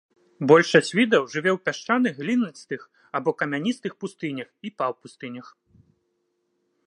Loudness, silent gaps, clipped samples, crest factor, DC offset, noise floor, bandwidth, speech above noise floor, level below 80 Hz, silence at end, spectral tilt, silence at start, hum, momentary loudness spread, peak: -23 LUFS; none; under 0.1%; 22 dB; under 0.1%; -73 dBFS; 10.5 kHz; 50 dB; -76 dBFS; 1.45 s; -5 dB/octave; 0.4 s; none; 19 LU; -2 dBFS